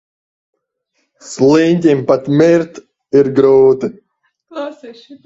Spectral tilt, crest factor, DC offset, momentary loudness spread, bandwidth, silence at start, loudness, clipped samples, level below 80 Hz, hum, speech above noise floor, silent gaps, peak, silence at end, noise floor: -7 dB/octave; 14 dB; under 0.1%; 17 LU; 8 kHz; 1.25 s; -12 LUFS; under 0.1%; -56 dBFS; none; 55 dB; none; 0 dBFS; 0.1 s; -67 dBFS